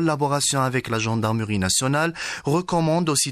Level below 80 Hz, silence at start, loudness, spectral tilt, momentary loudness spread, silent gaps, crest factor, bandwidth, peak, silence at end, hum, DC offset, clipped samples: -52 dBFS; 0 s; -22 LUFS; -4 dB/octave; 4 LU; none; 14 dB; 14.5 kHz; -8 dBFS; 0 s; none; under 0.1%; under 0.1%